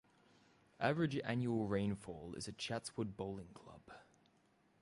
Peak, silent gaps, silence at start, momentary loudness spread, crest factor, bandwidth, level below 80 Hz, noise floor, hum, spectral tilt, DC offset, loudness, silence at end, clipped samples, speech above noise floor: -22 dBFS; none; 0.8 s; 21 LU; 20 dB; 11.5 kHz; -68 dBFS; -74 dBFS; none; -6 dB/octave; under 0.1%; -41 LUFS; 0.8 s; under 0.1%; 33 dB